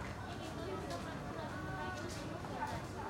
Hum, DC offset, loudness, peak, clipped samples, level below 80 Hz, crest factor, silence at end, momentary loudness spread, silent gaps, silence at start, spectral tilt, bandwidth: none; under 0.1%; -43 LUFS; -28 dBFS; under 0.1%; -56 dBFS; 14 dB; 0 s; 2 LU; none; 0 s; -5.5 dB/octave; 16 kHz